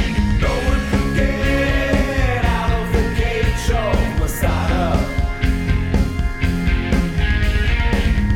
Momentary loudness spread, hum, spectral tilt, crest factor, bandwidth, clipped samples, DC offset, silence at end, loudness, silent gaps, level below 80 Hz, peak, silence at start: 2 LU; none; -6 dB/octave; 14 dB; 17 kHz; under 0.1%; under 0.1%; 0 s; -19 LUFS; none; -20 dBFS; -4 dBFS; 0 s